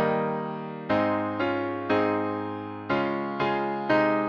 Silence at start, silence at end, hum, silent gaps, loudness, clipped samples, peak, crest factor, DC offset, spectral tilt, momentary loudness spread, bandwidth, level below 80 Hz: 0 s; 0 s; none; none; -27 LUFS; under 0.1%; -10 dBFS; 16 dB; under 0.1%; -8 dB/octave; 8 LU; 6.6 kHz; -64 dBFS